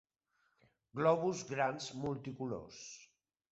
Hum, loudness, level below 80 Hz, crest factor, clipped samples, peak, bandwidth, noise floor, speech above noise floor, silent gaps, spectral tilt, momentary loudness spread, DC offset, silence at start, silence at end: none; -37 LUFS; -72 dBFS; 22 dB; under 0.1%; -18 dBFS; 8 kHz; -80 dBFS; 43 dB; none; -5 dB/octave; 18 LU; under 0.1%; 0.95 s; 0.45 s